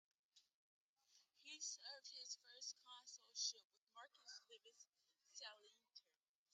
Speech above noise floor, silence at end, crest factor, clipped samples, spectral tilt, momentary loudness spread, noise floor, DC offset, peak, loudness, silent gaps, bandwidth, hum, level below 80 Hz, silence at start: 22 dB; 0.55 s; 26 dB; under 0.1%; 4.5 dB/octave; 21 LU; -80 dBFS; under 0.1%; -32 dBFS; -53 LUFS; 0.54-0.96 s, 3.64-3.70 s, 3.77-3.87 s, 4.89-4.93 s; 10.5 kHz; none; under -90 dBFS; 0.35 s